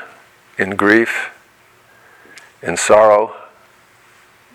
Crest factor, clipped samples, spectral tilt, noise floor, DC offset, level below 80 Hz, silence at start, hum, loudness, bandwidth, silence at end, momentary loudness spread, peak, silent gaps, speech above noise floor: 18 dB; under 0.1%; -3.5 dB/octave; -50 dBFS; under 0.1%; -58 dBFS; 0 s; none; -14 LUFS; 15 kHz; 1.1 s; 18 LU; 0 dBFS; none; 37 dB